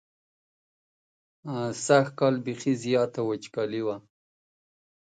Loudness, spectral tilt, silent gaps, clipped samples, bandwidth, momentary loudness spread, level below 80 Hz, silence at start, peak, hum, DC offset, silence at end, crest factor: -27 LUFS; -5.5 dB/octave; none; under 0.1%; 9.4 kHz; 11 LU; -74 dBFS; 1.45 s; -8 dBFS; none; under 0.1%; 1.05 s; 20 dB